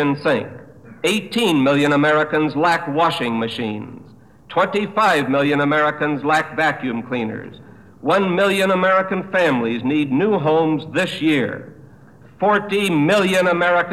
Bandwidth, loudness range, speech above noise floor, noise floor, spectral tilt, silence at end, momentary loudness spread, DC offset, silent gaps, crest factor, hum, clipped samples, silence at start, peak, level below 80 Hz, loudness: 15 kHz; 2 LU; 27 dB; -45 dBFS; -5.5 dB/octave; 0 s; 9 LU; 0.2%; none; 14 dB; none; under 0.1%; 0 s; -4 dBFS; -60 dBFS; -18 LUFS